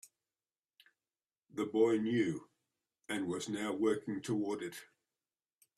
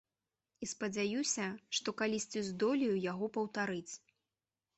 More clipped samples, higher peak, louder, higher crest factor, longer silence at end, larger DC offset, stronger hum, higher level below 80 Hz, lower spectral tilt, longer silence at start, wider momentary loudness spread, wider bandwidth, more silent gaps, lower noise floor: neither; first, -18 dBFS vs -22 dBFS; about the same, -36 LUFS vs -37 LUFS; about the same, 20 dB vs 16 dB; first, 0.95 s vs 0.8 s; neither; neither; about the same, -78 dBFS vs -76 dBFS; first, -5.5 dB/octave vs -3.5 dB/octave; first, 1.55 s vs 0.6 s; first, 15 LU vs 10 LU; first, 14 kHz vs 8.2 kHz; neither; about the same, under -90 dBFS vs under -90 dBFS